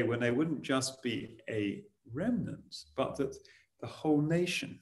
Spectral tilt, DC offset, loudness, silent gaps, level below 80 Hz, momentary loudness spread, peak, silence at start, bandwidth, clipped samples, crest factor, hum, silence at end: -5.5 dB/octave; under 0.1%; -34 LUFS; none; -66 dBFS; 15 LU; -16 dBFS; 0 s; 12.5 kHz; under 0.1%; 18 dB; none; 0.05 s